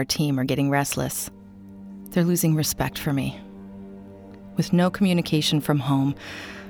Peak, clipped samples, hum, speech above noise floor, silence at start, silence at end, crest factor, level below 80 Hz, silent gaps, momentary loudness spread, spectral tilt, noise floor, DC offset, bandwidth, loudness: -8 dBFS; under 0.1%; none; 20 dB; 0 s; 0 s; 18 dB; -50 dBFS; none; 21 LU; -5 dB/octave; -43 dBFS; under 0.1%; over 20 kHz; -23 LUFS